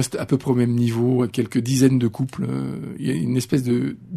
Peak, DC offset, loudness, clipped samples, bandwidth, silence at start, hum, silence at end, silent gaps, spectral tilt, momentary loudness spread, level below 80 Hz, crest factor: -4 dBFS; under 0.1%; -21 LUFS; under 0.1%; 13.5 kHz; 0 s; none; 0 s; none; -6.5 dB/octave; 8 LU; -56 dBFS; 18 dB